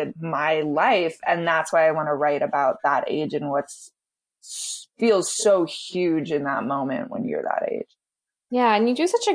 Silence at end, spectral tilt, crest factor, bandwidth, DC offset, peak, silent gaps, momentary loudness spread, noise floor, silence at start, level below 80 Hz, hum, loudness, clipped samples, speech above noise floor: 0 s; -4 dB/octave; 16 dB; 10.5 kHz; under 0.1%; -6 dBFS; none; 10 LU; -88 dBFS; 0 s; -74 dBFS; none; -23 LUFS; under 0.1%; 66 dB